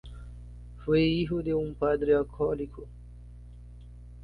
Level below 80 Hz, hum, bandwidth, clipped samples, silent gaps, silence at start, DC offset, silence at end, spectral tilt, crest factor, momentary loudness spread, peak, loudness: -46 dBFS; 60 Hz at -45 dBFS; 5 kHz; under 0.1%; none; 0.05 s; under 0.1%; 0 s; -8.5 dB/octave; 16 dB; 24 LU; -14 dBFS; -28 LUFS